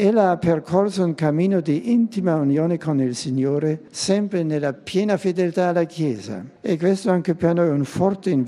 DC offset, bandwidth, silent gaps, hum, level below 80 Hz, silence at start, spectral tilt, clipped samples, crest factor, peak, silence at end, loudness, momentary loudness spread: under 0.1%; 12 kHz; none; none; -60 dBFS; 0 s; -7 dB/octave; under 0.1%; 16 dB; -4 dBFS; 0 s; -21 LUFS; 5 LU